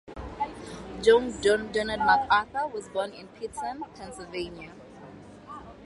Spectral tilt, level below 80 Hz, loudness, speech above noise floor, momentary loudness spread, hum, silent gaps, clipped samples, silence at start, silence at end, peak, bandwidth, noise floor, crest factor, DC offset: -4 dB/octave; -52 dBFS; -27 LUFS; 20 dB; 23 LU; none; none; under 0.1%; 0.05 s; 0 s; -8 dBFS; 11.5 kHz; -47 dBFS; 20 dB; under 0.1%